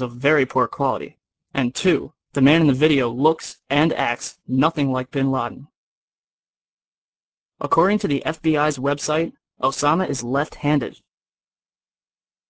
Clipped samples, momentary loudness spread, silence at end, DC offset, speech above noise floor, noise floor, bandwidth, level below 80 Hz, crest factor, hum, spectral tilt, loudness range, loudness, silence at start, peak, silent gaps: under 0.1%; 11 LU; 1.6 s; under 0.1%; over 70 dB; under -90 dBFS; 8 kHz; -54 dBFS; 18 dB; none; -5.5 dB/octave; 6 LU; -21 LUFS; 0 s; -4 dBFS; 5.75-6.77 s, 6.84-7.49 s